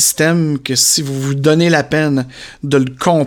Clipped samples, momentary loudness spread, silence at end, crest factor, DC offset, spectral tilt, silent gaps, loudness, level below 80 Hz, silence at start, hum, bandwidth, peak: under 0.1%; 8 LU; 0 s; 14 dB; under 0.1%; -4 dB/octave; none; -13 LUFS; -50 dBFS; 0 s; none; 17.5 kHz; 0 dBFS